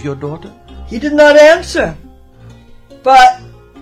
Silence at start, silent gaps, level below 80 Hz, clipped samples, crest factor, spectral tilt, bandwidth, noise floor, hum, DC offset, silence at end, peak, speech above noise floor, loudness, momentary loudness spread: 0.05 s; none; -36 dBFS; 0.1%; 12 dB; -4 dB/octave; 13.5 kHz; -38 dBFS; none; under 0.1%; 0.45 s; 0 dBFS; 29 dB; -9 LUFS; 21 LU